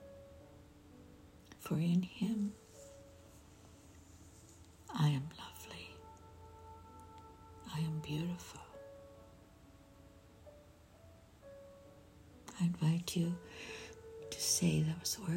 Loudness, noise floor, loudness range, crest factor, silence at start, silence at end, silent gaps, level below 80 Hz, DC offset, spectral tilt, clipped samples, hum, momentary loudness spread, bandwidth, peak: -38 LUFS; -61 dBFS; 18 LU; 20 dB; 0 s; 0 s; none; -68 dBFS; under 0.1%; -5 dB/octave; under 0.1%; none; 26 LU; 16 kHz; -20 dBFS